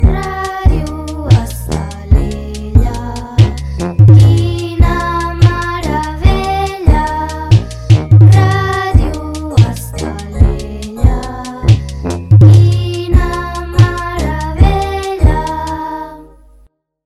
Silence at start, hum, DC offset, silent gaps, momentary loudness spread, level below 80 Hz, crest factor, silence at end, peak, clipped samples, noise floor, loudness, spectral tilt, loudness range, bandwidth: 0 s; none; under 0.1%; none; 14 LU; -18 dBFS; 10 dB; 0.8 s; 0 dBFS; 4%; -48 dBFS; -12 LUFS; -7 dB/octave; 4 LU; 12.5 kHz